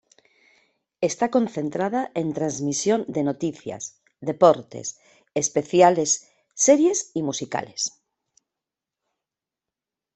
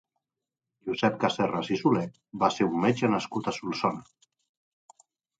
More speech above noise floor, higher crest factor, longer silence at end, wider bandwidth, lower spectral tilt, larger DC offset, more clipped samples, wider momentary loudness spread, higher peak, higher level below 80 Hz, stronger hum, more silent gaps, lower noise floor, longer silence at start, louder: first, 66 dB vs 62 dB; about the same, 22 dB vs 22 dB; first, 2.3 s vs 1.35 s; about the same, 8.4 kHz vs 9.2 kHz; second, -4 dB/octave vs -6 dB/octave; neither; neither; first, 16 LU vs 8 LU; first, -2 dBFS vs -8 dBFS; about the same, -68 dBFS vs -66 dBFS; neither; neither; about the same, -88 dBFS vs -89 dBFS; first, 1 s vs 0.85 s; first, -22 LUFS vs -27 LUFS